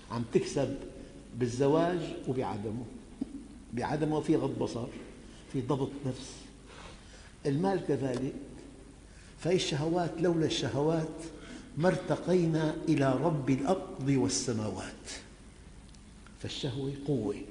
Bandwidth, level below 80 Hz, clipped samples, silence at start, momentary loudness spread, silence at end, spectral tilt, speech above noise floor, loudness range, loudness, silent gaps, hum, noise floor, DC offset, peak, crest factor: 10.5 kHz; -54 dBFS; under 0.1%; 0 s; 20 LU; 0 s; -6 dB/octave; 21 dB; 6 LU; -32 LUFS; none; none; -52 dBFS; under 0.1%; -14 dBFS; 20 dB